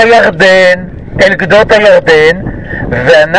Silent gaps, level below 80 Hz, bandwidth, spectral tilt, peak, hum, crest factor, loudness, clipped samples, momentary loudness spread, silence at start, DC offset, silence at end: none; -28 dBFS; 11 kHz; -5 dB/octave; 0 dBFS; none; 6 dB; -6 LUFS; 6%; 12 LU; 0 s; 2%; 0 s